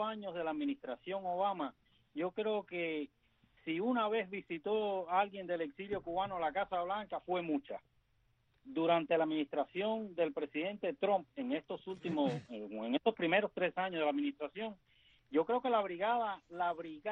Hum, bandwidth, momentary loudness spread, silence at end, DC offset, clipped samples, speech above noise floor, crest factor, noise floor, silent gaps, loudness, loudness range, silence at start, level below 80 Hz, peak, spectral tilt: none; 7.2 kHz; 9 LU; 0 s; under 0.1%; under 0.1%; 39 dB; 20 dB; -75 dBFS; none; -37 LUFS; 3 LU; 0 s; -74 dBFS; -16 dBFS; -3.5 dB/octave